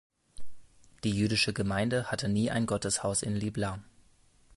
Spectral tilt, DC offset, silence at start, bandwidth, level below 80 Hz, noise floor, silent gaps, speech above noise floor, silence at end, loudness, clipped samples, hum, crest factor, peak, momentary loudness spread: -4.5 dB/octave; under 0.1%; 0.35 s; 11.5 kHz; -54 dBFS; -62 dBFS; none; 33 dB; 0.55 s; -30 LUFS; under 0.1%; none; 18 dB; -14 dBFS; 8 LU